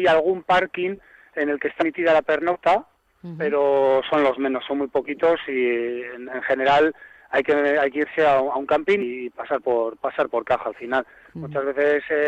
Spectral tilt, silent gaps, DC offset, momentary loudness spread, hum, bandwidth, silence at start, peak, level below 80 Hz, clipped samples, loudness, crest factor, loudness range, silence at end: -6 dB/octave; none; under 0.1%; 10 LU; none; 9 kHz; 0 s; -8 dBFS; -58 dBFS; under 0.1%; -22 LUFS; 14 dB; 2 LU; 0 s